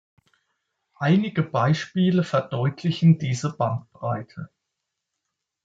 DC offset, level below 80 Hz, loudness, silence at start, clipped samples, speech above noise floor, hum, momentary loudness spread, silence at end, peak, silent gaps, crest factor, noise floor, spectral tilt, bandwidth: under 0.1%; -66 dBFS; -23 LUFS; 1 s; under 0.1%; 60 dB; none; 11 LU; 1.2 s; -6 dBFS; none; 18 dB; -82 dBFS; -7 dB/octave; 7.8 kHz